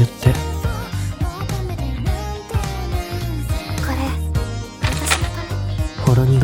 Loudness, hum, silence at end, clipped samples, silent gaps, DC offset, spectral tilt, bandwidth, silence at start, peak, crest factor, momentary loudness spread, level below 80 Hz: -22 LUFS; none; 0 s; under 0.1%; none; under 0.1%; -5.5 dB/octave; 17.5 kHz; 0 s; 0 dBFS; 20 dB; 8 LU; -26 dBFS